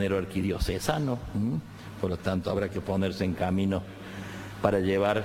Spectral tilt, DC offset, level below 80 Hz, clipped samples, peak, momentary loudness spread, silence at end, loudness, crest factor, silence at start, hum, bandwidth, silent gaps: -6.5 dB/octave; under 0.1%; -44 dBFS; under 0.1%; -6 dBFS; 13 LU; 0 s; -29 LUFS; 22 dB; 0 s; none; 16.5 kHz; none